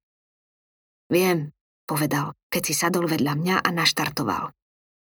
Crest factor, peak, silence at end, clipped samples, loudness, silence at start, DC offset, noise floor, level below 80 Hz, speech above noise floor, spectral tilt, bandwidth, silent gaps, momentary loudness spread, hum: 24 dB; -2 dBFS; 0.6 s; under 0.1%; -23 LUFS; 1.1 s; under 0.1%; under -90 dBFS; -62 dBFS; over 67 dB; -4 dB/octave; over 20 kHz; 1.61-1.88 s, 2.43-2.50 s; 9 LU; none